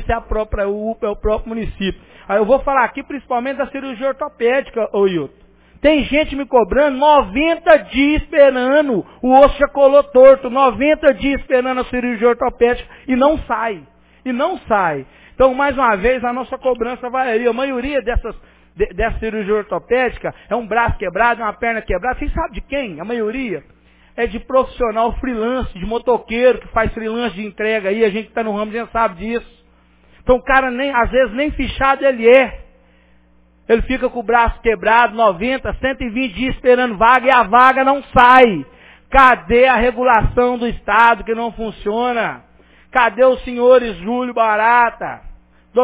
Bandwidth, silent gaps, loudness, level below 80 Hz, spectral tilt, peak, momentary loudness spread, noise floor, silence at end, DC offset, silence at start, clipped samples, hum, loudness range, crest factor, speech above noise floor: 4 kHz; none; -15 LUFS; -32 dBFS; -9 dB/octave; 0 dBFS; 12 LU; -52 dBFS; 0 s; under 0.1%; 0 s; under 0.1%; none; 8 LU; 16 dB; 37 dB